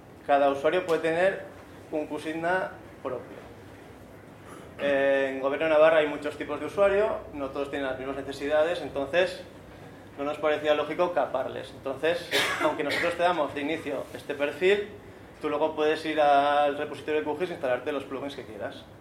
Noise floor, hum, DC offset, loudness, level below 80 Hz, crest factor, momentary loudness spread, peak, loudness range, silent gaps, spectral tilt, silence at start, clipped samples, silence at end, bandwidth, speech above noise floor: -47 dBFS; none; under 0.1%; -27 LUFS; -60 dBFS; 20 dB; 21 LU; -8 dBFS; 5 LU; none; -4.5 dB/octave; 0 s; under 0.1%; 0 s; 16 kHz; 21 dB